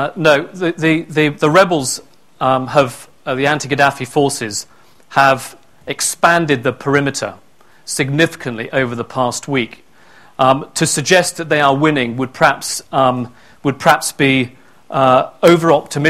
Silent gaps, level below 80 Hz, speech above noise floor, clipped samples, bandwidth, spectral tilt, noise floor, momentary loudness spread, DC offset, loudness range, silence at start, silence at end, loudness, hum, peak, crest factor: none; -52 dBFS; 32 dB; 0.1%; 17 kHz; -4 dB/octave; -46 dBFS; 12 LU; 0.4%; 4 LU; 0 s; 0 s; -15 LUFS; none; 0 dBFS; 16 dB